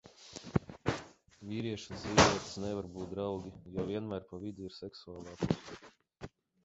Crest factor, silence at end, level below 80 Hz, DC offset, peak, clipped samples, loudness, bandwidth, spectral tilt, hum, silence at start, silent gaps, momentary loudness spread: 28 dB; 0.4 s; -54 dBFS; under 0.1%; -8 dBFS; under 0.1%; -35 LUFS; 8 kHz; -4 dB/octave; none; 0.05 s; none; 22 LU